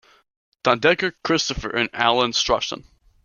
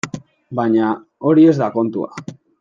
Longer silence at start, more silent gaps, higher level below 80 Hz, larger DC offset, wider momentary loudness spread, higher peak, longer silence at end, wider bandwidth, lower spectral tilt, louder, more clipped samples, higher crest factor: first, 0.65 s vs 0.05 s; neither; first, -44 dBFS vs -64 dBFS; neither; second, 6 LU vs 21 LU; about the same, -2 dBFS vs -2 dBFS; first, 0.45 s vs 0.3 s; about the same, 7.4 kHz vs 7.6 kHz; second, -3 dB/octave vs -7.5 dB/octave; second, -20 LUFS vs -16 LUFS; neither; first, 20 dB vs 14 dB